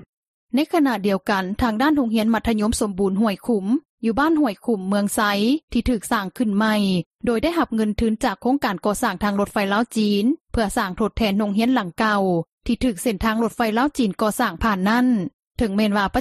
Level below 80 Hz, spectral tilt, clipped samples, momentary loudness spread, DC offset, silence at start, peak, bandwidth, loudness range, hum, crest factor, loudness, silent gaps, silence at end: -40 dBFS; -5.5 dB/octave; under 0.1%; 4 LU; under 0.1%; 0.55 s; -6 dBFS; 14 kHz; 1 LU; none; 14 dB; -21 LUFS; 3.85-3.98 s, 5.63-5.68 s, 7.06-7.11 s, 10.41-10.45 s, 12.52-12.58 s, 15.34-15.51 s; 0 s